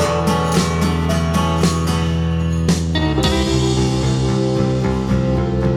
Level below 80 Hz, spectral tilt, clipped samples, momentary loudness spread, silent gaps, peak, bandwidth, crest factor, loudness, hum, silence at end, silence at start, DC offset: -26 dBFS; -6 dB/octave; under 0.1%; 2 LU; none; -6 dBFS; 15 kHz; 10 dB; -17 LUFS; none; 0 s; 0 s; under 0.1%